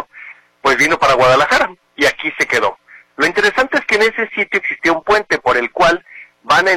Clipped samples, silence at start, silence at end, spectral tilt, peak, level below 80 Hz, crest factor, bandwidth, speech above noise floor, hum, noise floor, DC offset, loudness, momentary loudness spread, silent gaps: under 0.1%; 0 s; 0 s; -3 dB/octave; -2 dBFS; -46 dBFS; 12 dB; 16.5 kHz; 24 dB; none; -38 dBFS; under 0.1%; -14 LUFS; 7 LU; none